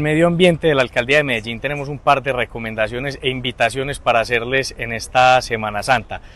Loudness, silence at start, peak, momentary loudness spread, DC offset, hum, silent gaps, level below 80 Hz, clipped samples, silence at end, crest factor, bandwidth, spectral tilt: -18 LUFS; 0 s; -2 dBFS; 9 LU; under 0.1%; none; none; -40 dBFS; under 0.1%; 0.1 s; 16 dB; 12.5 kHz; -5 dB/octave